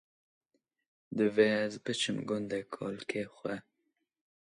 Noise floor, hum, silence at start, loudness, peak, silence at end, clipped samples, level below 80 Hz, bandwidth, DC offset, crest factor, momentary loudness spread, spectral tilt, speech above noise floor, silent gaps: -82 dBFS; none; 1.1 s; -33 LUFS; -14 dBFS; 0.9 s; under 0.1%; -76 dBFS; 11 kHz; under 0.1%; 22 dB; 13 LU; -4.5 dB/octave; 49 dB; none